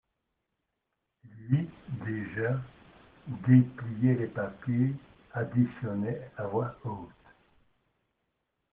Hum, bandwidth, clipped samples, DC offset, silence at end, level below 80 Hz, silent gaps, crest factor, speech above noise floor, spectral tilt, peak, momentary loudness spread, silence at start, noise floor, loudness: none; 3.7 kHz; under 0.1%; under 0.1%; 1.65 s; -64 dBFS; none; 22 dB; 54 dB; -9.5 dB/octave; -10 dBFS; 19 LU; 1.25 s; -83 dBFS; -30 LUFS